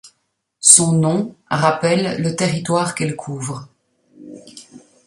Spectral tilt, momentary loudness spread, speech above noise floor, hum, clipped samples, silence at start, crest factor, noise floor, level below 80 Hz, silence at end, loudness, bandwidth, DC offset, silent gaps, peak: -3.5 dB/octave; 18 LU; 53 dB; none; 0.1%; 0.05 s; 20 dB; -70 dBFS; -58 dBFS; 0.3 s; -16 LUFS; 15.5 kHz; under 0.1%; none; 0 dBFS